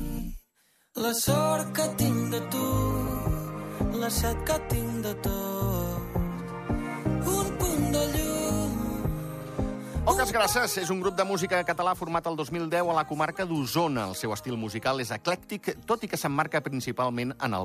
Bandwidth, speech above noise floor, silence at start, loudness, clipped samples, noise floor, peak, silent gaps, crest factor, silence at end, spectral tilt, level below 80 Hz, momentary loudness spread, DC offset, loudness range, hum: 15.5 kHz; 40 dB; 0 s; -28 LUFS; under 0.1%; -68 dBFS; -12 dBFS; none; 18 dB; 0 s; -4.5 dB/octave; -40 dBFS; 8 LU; under 0.1%; 3 LU; none